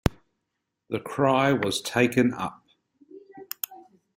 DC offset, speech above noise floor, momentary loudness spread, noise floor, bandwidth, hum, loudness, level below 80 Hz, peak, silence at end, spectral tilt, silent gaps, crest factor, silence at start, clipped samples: under 0.1%; 57 dB; 14 LU; -81 dBFS; 16 kHz; none; -25 LUFS; -48 dBFS; -4 dBFS; 0.35 s; -5 dB/octave; none; 24 dB; 0.05 s; under 0.1%